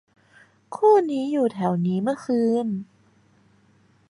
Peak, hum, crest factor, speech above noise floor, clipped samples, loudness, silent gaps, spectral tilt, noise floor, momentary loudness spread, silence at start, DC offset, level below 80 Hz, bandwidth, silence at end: -6 dBFS; none; 18 dB; 38 dB; under 0.1%; -22 LUFS; none; -8 dB/octave; -59 dBFS; 11 LU; 0.7 s; under 0.1%; -72 dBFS; 11 kHz; 1.25 s